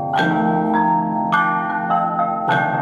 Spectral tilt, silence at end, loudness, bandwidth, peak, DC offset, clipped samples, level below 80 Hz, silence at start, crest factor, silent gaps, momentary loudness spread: -7 dB/octave; 0 s; -18 LUFS; 10.5 kHz; -4 dBFS; under 0.1%; under 0.1%; -58 dBFS; 0 s; 14 dB; none; 3 LU